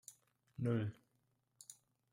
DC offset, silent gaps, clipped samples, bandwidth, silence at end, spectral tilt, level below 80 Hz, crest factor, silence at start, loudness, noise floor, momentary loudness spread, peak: under 0.1%; none; under 0.1%; 15.5 kHz; 0.4 s; -7 dB/octave; -78 dBFS; 18 dB; 0.1 s; -41 LUFS; -81 dBFS; 20 LU; -26 dBFS